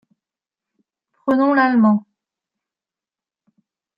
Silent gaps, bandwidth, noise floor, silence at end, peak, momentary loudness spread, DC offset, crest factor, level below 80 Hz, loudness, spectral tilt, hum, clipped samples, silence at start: none; 5.6 kHz; -90 dBFS; 2 s; -4 dBFS; 8 LU; under 0.1%; 18 dB; -68 dBFS; -17 LUFS; -9 dB/octave; none; under 0.1%; 1.25 s